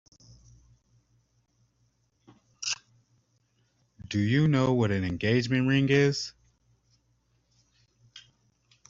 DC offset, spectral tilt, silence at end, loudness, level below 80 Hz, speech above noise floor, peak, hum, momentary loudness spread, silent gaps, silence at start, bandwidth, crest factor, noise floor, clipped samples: under 0.1%; -6 dB/octave; 0.7 s; -26 LUFS; -60 dBFS; 47 dB; -10 dBFS; none; 11 LU; none; 2.6 s; 7.8 kHz; 22 dB; -71 dBFS; under 0.1%